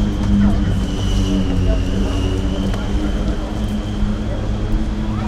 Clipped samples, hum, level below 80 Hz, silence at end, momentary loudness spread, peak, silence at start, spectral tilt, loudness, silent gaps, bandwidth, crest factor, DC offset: under 0.1%; none; -20 dBFS; 0 s; 6 LU; -4 dBFS; 0 s; -7 dB/octave; -20 LUFS; none; 11.5 kHz; 14 dB; under 0.1%